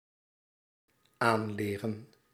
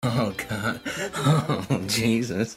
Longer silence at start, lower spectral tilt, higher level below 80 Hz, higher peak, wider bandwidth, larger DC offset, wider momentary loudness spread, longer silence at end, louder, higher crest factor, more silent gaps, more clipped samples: first, 1.2 s vs 0 s; about the same, -6 dB/octave vs -5 dB/octave; second, -76 dBFS vs -54 dBFS; about the same, -10 dBFS vs -10 dBFS; about the same, 16 kHz vs 16 kHz; neither; first, 10 LU vs 6 LU; first, 0.3 s vs 0 s; second, -32 LUFS vs -25 LUFS; first, 26 dB vs 16 dB; neither; neither